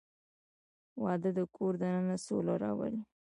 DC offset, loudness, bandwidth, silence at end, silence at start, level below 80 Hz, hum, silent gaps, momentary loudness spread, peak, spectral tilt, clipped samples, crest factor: under 0.1%; -35 LUFS; 11 kHz; 0.2 s; 0.95 s; -74 dBFS; none; none; 6 LU; -20 dBFS; -7.5 dB/octave; under 0.1%; 16 dB